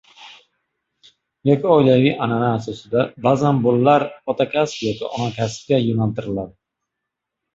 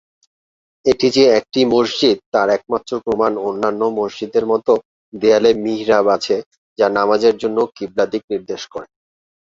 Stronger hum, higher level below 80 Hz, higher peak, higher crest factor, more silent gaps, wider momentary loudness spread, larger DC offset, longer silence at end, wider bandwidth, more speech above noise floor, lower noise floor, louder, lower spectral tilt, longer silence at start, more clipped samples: neither; about the same, -54 dBFS vs -56 dBFS; about the same, -2 dBFS vs 0 dBFS; about the same, 18 dB vs 16 dB; second, none vs 2.26-2.32 s, 4.85-5.12 s, 6.46-6.51 s, 6.58-6.76 s, 8.24-8.28 s; about the same, 11 LU vs 9 LU; neither; first, 1.05 s vs 0.75 s; about the same, 8 kHz vs 7.8 kHz; second, 63 dB vs over 74 dB; second, -81 dBFS vs under -90 dBFS; about the same, -19 LUFS vs -17 LUFS; first, -7 dB/octave vs -4.5 dB/octave; second, 0.2 s vs 0.85 s; neither